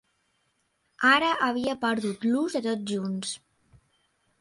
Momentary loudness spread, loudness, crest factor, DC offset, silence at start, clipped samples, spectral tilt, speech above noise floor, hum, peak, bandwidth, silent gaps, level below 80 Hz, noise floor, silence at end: 11 LU; -26 LUFS; 20 dB; under 0.1%; 1 s; under 0.1%; -4 dB/octave; 47 dB; none; -8 dBFS; 11.5 kHz; none; -68 dBFS; -73 dBFS; 1.05 s